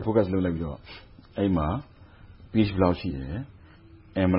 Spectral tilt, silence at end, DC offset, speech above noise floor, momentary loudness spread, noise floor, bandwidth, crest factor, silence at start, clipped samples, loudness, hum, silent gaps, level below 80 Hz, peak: -12 dB/octave; 0 s; under 0.1%; 25 dB; 18 LU; -51 dBFS; 5.6 kHz; 20 dB; 0 s; under 0.1%; -27 LUFS; none; none; -44 dBFS; -8 dBFS